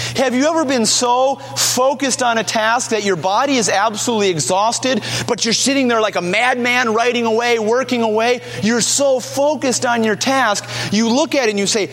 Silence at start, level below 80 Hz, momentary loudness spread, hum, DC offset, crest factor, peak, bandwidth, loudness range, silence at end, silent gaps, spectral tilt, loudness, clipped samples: 0 s; -58 dBFS; 4 LU; none; under 0.1%; 16 dB; 0 dBFS; 16.5 kHz; 1 LU; 0 s; none; -2.5 dB/octave; -15 LUFS; under 0.1%